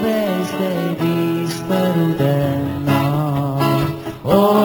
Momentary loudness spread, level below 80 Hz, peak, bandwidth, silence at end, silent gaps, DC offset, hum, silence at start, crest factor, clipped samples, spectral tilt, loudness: 4 LU; -46 dBFS; 0 dBFS; 17.5 kHz; 0 s; none; under 0.1%; none; 0 s; 16 dB; under 0.1%; -7 dB/octave; -18 LUFS